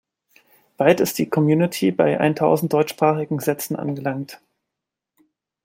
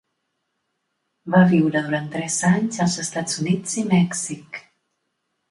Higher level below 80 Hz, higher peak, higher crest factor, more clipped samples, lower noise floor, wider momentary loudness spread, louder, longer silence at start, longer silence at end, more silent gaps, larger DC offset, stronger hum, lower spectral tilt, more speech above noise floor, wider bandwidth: about the same, -64 dBFS vs -64 dBFS; about the same, -2 dBFS vs -2 dBFS; about the same, 20 dB vs 20 dB; neither; first, -84 dBFS vs -75 dBFS; second, 8 LU vs 15 LU; about the same, -20 LUFS vs -20 LUFS; second, 0.8 s vs 1.25 s; first, 1.3 s vs 0.9 s; neither; neither; neither; about the same, -6 dB/octave vs -5 dB/octave; first, 65 dB vs 55 dB; first, 16.5 kHz vs 11.5 kHz